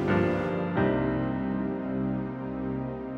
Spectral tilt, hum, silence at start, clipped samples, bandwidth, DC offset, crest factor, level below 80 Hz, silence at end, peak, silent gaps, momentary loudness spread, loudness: -9.5 dB/octave; none; 0 s; under 0.1%; 7 kHz; under 0.1%; 16 dB; -48 dBFS; 0 s; -12 dBFS; none; 7 LU; -29 LUFS